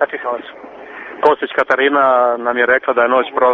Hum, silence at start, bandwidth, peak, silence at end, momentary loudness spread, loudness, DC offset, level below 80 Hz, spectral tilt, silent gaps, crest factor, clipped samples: none; 0 s; 7 kHz; 0 dBFS; 0 s; 19 LU; -14 LUFS; under 0.1%; -60 dBFS; -0.5 dB/octave; none; 16 dB; under 0.1%